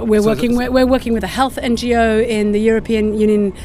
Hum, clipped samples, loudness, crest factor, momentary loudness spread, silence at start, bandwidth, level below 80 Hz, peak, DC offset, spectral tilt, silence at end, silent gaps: none; under 0.1%; -15 LUFS; 14 dB; 4 LU; 0 s; 16 kHz; -32 dBFS; 0 dBFS; under 0.1%; -6 dB/octave; 0 s; none